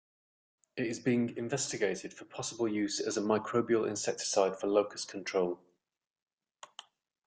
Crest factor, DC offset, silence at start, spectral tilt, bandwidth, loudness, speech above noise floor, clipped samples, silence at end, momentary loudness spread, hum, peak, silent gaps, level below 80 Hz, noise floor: 20 dB; under 0.1%; 0.75 s; -4 dB/octave; 9.6 kHz; -33 LUFS; 26 dB; under 0.1%; 1.7 s; 15 LU; none; -14 dBFS; none; -74 dBFS; -58 dBFS